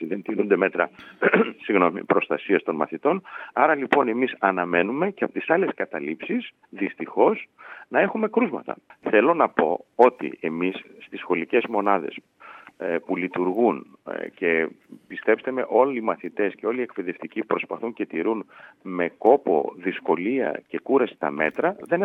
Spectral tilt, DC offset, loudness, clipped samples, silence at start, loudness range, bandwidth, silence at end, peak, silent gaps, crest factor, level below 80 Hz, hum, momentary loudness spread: -8 dB/octave; under 0.1%; -24 LUFS; under 0.1%; 0 s; 3 LU; 4.2 kHz; 0 s; -2 dBFS; none; 22 dB; -80 dBFS; none; 12 LU